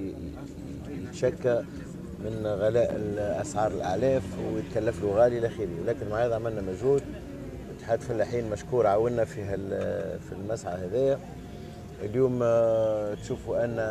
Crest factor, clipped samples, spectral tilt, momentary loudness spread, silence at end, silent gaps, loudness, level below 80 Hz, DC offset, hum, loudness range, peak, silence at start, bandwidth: 18 dB; under 0.1%; -7 dB/octave; 16 LU; 0 s; none; -28 LUFS; -50 dBFS; under 0.1%; none; 3 LU; -10 dBFS; 0 s; 14 kHz